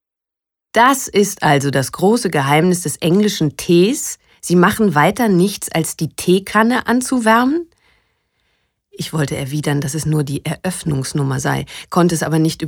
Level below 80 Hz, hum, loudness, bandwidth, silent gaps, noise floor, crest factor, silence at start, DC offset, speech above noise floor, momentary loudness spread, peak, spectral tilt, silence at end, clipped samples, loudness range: -48 dBFS; none; -16 LUFS; 19 kHz; none; -85 dBFS; 16 dB; 0.75 s; under 0.1%; 70 dB; 9 LU; 0 dBFS; -5 dB/octave; 0 s; under 0.1%; 6 LU